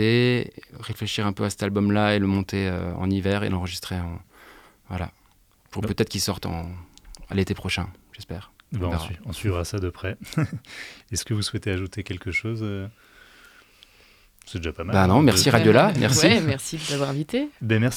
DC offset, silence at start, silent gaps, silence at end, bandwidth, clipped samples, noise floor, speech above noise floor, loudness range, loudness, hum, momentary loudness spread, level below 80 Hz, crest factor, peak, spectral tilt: under 0.1%; 0 s; none; 0 s; 17 kHz; under 0.1%; -59 dBFS; 36 dB; 11 LU; -23 LUFS; none; 19 LU; -50 dBFS; 24 dB; 0 dBFS; -5 dB/octave